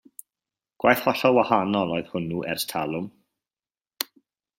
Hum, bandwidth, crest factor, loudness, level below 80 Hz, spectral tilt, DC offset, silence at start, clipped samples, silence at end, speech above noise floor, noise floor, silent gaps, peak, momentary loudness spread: none; 16.5 kHz; 26 dB; -24 LUFS; -64 dBFS; -4.5 dB/octave; under 0.1%; 0.85 s; under 0.1%; 0.55 s; over 67 dB; under -90 dBFS; none; 0 dBFS; 12 LU